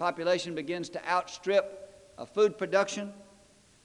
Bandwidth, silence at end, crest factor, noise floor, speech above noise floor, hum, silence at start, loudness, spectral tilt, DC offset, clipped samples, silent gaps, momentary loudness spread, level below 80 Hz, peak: 11 kHz; 0.6 s; 20 dB; -60 dBFS; 31 dB; none; 0 s; -30 LUFS; -4 dB/octave; under 0.1%; under 0.1%; none; 15 LU; -72 dBFS; -10 dBFS